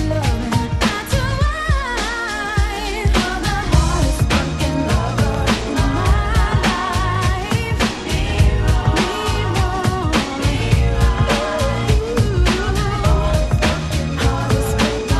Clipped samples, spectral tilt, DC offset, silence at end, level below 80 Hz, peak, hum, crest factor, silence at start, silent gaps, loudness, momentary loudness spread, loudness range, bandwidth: under 0.1%; -5.5 dB/octave; under 0.1%; 0 s; -22 dBFS; 0 dBFS; none; 16 dB; 0 s; none; -18 LUFS; 3 LU; 1 LU; 13 kHz